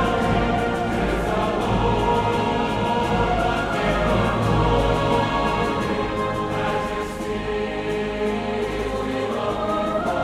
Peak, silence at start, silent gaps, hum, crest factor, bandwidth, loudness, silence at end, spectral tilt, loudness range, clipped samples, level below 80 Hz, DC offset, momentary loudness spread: -6 dBFS; 0 s; none; none; 14 dB; 14.5 kHz; -22 LUFS; 0 s; -6 dB/octave; 4 LU; under 0.1%; -32 dBFS; under 0.1%; 5 LU